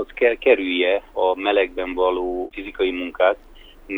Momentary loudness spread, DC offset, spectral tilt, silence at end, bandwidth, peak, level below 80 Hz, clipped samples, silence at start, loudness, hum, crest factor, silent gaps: 8 LU; under 0.1%; -5.5 dB/octave; 0 s; 4.2 kHz; -2 dBFS; -46 dBFS; under 0.1%; 0 s; -21 LUFS; none; 18 dB; none